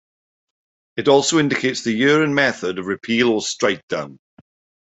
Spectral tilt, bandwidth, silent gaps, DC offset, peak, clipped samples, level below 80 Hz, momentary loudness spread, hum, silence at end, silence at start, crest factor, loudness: -4 dB/octave; 8.2 kHz; 3.83-3.88 s; under 0.1%; -2 dBFS; under 0.1%; -62 dBFS; 11 LU; none; 0.75 s; 0.95 s; 18 dB; -18 LUFS